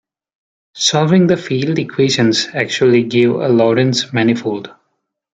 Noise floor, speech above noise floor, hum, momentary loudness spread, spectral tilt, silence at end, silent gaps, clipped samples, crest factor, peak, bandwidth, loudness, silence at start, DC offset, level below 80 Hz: -70 dBFS; 56 dB; none; 6 LU; -5 dB/octave; 0.65 s; none; under 0.1%; 14 dB; 0 dBFS; 9.4 kHz; -14 LUFS; 0.75 s; under 0.1%; -58 dBFS